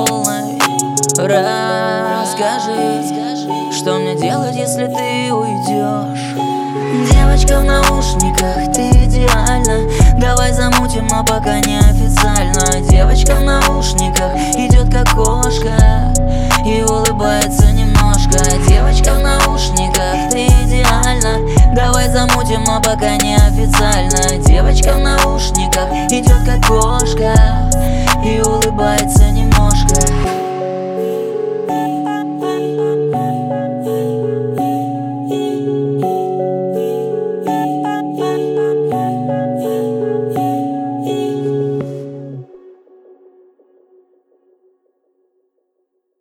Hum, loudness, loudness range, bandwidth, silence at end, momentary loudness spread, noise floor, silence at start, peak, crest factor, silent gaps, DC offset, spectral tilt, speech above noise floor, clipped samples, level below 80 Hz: none; -14 LUFS; 6 LU; 16.5 kHz; 3.75 s; 7 LU; -68 dBFS; 0 s; 0 dBFS; 12 dB; none; under 0.1%; -4.5 dB/octave; 57 dB; under 0.1%; -16 dBFS